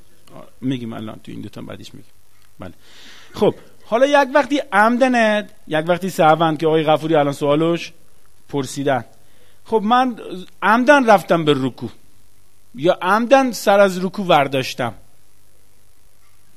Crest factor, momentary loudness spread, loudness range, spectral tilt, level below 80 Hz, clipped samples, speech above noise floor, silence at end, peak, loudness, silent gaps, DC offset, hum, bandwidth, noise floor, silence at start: 18 dB; 20 LU; 6 LU; -5.5 dB/octave; -58 dBFS; under 0.1%; 39 dB; 1.65 s; 0 dBFS; -17 LUFS; none; 1%; none; 15 kHz; -56 dBFS; 0.35 s